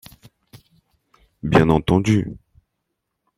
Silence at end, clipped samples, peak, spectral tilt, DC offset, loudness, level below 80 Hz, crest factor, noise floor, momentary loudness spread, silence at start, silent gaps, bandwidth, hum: 1 s; under 0.1%; -2 dBFS; -7 dB/octave; under 0.1%; -18 LUFS; -42 dBFS; 20 dB; -77 dBFS; 15 LU; 1.45 s; none; 15.5 kHz; none